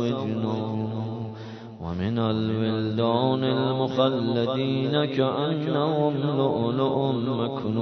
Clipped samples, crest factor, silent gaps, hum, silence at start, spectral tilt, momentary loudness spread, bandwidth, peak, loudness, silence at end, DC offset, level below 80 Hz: under 0.1%; 18 dB; none; none; 0 s; -8.5 dB/octave; 8 LU; 6.4 kHz; -8 dBFS; -25 LUFS; 0 s; under 0.1%; -62 dBFS